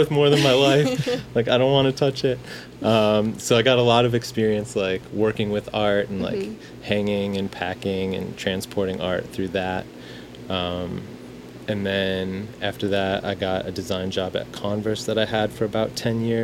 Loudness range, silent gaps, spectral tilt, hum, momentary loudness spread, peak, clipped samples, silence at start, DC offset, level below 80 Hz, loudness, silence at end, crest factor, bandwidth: 8 LU; none; -5.5 dB/octave; none; 12 LU; -4 dBFS; under 0.1%; 0 s; under 0.1%; -52 dBFS; -23 LUFS; 0 s; 20 dB; 16.5 kHz